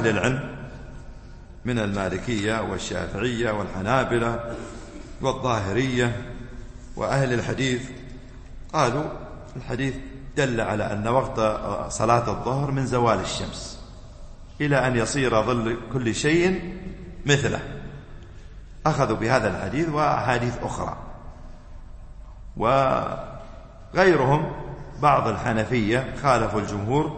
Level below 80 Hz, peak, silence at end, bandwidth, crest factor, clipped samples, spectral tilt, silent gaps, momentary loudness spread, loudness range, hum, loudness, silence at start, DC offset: -40 dBFS; -4 dBFS; 0 s; 8.8 kHz; 22 dB; under 0.1%; -5.5 dB/octave; none; 20 LU; 5 LU; none; -24 LUFS; 0 s; under 0.1%